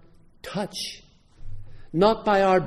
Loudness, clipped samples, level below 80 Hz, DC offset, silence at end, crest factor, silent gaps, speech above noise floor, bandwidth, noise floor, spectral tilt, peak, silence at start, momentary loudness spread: -24 LUFS; under 0.1%; -44 dBFS; under 0.1%; 0 s; 20 dB; none; 23 dB; 14.5 kHz; -44 dBFS; -5.5 dB/octave; -6 dBFS; 0.45 s; 25 LU